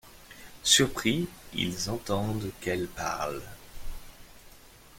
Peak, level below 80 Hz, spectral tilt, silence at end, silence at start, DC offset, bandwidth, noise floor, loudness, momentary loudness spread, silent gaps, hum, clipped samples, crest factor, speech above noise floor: -6 dBFS; -48 dBFS; -3 dB/octave; 0 s; 0.05 s; under 0.1%; 16.5 kHz; -53 dBFS; -28 LUFS; 26 LU; none; none; under 0.1%; 24 dB; 24 dB